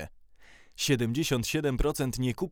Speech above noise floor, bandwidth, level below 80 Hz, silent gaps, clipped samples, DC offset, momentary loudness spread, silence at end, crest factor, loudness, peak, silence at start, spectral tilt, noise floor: 26 dB; over 20 kHz; -40 dBFS; none; under 0.1%; under 0.1%; 8 LU; 0 s; 18 dB; -29 LUFS; -12 dBFS; 0 s; -5 dB/octave; -54 dBFS